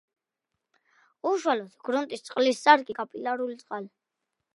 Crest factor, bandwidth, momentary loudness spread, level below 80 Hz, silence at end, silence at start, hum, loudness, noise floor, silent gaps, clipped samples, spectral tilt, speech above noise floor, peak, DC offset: 26 dB; 11.5 kHz; 17 LU; -84 dBFS; 0.7 s; 1.25 s; none; -26 LUFS; -85 dBFS; none; under 0.1%; -3 dB/octave; 59 dB; -4 dBFS; under 0.1%